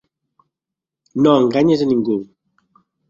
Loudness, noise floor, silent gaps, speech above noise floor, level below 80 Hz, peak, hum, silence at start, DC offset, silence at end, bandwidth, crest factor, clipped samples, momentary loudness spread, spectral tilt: -16 LUFS; -85 dBFS; none; 71 dB; -58 dBFS; -2 dBFS; none; 1.15 s; under 0.1%; 0.85 s; 7.4 kHz; 18 dB; under 0.1%; 10 LU; -7.5 dB/octave